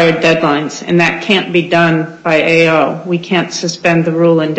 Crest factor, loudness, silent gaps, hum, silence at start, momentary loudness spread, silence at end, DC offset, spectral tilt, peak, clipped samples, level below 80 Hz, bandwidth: 12 dB; -12 LUFS; none; none; 0 s; 6 LU; 0 s; under 0.1%; -5.5 dB/octave; 0 dBFS; under 0.1%; -52 dBFS; 8.4 kHz